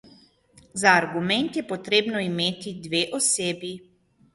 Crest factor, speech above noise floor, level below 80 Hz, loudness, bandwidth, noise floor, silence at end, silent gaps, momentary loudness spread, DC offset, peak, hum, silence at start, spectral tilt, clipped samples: 22 dB; 32 dB; -64 dBFS; -23 LUFS; 11.5 kHz; -57 dBFS; 0.55 s; none; 16 LU; under 0.1%; -4 dBFS; none; 0.75 s; -2.5 dB/octave; under 0.1%